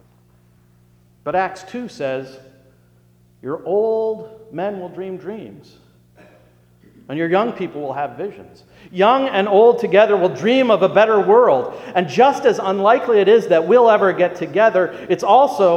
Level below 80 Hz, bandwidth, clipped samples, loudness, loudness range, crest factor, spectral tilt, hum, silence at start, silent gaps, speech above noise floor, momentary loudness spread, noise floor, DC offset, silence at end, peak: -62 dBFS; 11.5 kHz; under 0.1%; -16 LUFS; 13 LU; 16 dB; -6 dB/octave; 60 Hz at -50 dBFS; 1.25 s; none; 37 dB; 17 LU; -53 dBFS; under 0.1%; 0 s; 0 dBFS